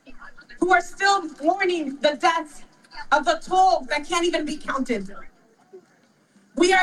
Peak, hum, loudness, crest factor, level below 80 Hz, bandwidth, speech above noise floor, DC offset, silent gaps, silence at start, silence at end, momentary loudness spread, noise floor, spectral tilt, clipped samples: -4 dBFS; none; -22 LUFS; 18 dB; -46 dBFS; 12.5 kHz; 38 dB; under 0.1%; none; 0.05 s; 0 s; 11 LU; -60 dBFS; -2.5 dB/octave; under 0.1%